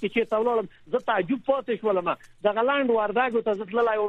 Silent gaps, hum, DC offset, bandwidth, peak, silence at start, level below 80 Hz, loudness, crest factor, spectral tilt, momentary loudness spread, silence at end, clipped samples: none; none; under 0.1%; 6.6 kHz; -8 dBFS; 0 s; -64 dBFS; -25 LUFS; 16 dB; -7 dB/octave; 5 LU; 0 s; under 0.1%